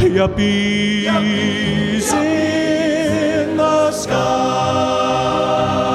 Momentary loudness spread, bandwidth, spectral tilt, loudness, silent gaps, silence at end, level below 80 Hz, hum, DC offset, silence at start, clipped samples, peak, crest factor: 2 LU; 14.5 kHz; -5 dB/octave; -16 LUFS; none; 0 s; -40 dBFS; none; under 0.1%; 0 s; under 0.1%; -2 dBFS; 14 dB